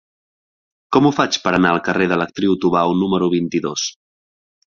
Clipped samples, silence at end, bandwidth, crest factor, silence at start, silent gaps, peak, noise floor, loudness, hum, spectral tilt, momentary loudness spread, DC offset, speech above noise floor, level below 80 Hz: under 0.1%; 0.8 s; 7.4 kHz; 18 dB; 0.9 s; none; -2 dBFS; under -90 dBFS; -17 LUFS; none; -5 dB/octave; 5 LU; under 0.1%; over 73 dB; -54 dBFS